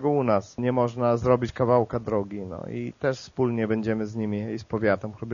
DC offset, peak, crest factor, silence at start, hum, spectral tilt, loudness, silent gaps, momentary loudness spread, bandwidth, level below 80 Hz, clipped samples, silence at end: under 0.1%; -6 dBFS; 20 dB; 0 s; none; -7 dB/octave; -26 LUFS; none; 9 LU; 7.2 kHz; -52 dBFS; under 0.1%; 0 s